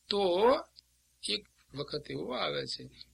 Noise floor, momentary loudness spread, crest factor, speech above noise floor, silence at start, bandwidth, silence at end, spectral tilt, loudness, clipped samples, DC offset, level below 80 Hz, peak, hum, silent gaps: -63 dBFS; 15 LU; 22 dB; 31 dB; 0.1 s; 13 kHz; 0.1 s; -4 dB/octave; -33 LUFS; under 0.1%; under 0.1%; -64 dBFS; -12 dBFS; none; none